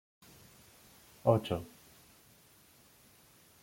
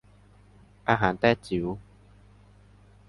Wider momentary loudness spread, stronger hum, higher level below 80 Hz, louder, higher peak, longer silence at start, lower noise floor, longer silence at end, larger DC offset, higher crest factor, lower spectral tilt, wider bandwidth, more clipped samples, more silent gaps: first, 28 LU vs 12 LU; second, none vs 50 Hz at -50 dBFS; second, -68 dBFS vs -52 dBFS; second, -33 LUFS vs -26 LUFS; second, -12 dBFS vs -6 dBFS; first, 1.25 s vs 0.85 s; first, -63 dBFS vs -56 dBFS; first, 1.95 s vs 1.3 s; neither; about the same, 28 dB vs 24 dB; about the same, -7 dB/octave vs -7 dB/octave; first, 16.5 kHz vs 11.5 kHz; neither; neither